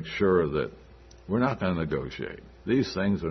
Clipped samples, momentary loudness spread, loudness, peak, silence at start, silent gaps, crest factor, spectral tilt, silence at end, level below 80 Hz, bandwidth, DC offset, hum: under 0.1%; 13 LU; -28 LUFS; -10 dBFS; 0 s; none; 18 dB; -7.5 dB/octave; 0 s; -50 dBFS; 6.4 kHz; under 0.1%; none